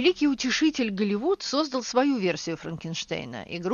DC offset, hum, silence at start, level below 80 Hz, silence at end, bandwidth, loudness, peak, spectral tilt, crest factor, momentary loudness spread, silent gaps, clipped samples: under 0.1%; none; 0 s; -60 dBFS; 0 s; 7.4 kHz; -26 LUFS; -10 dBFS; -4.5 dB/octave; 16 dB; 10 LU; none; under 0.1%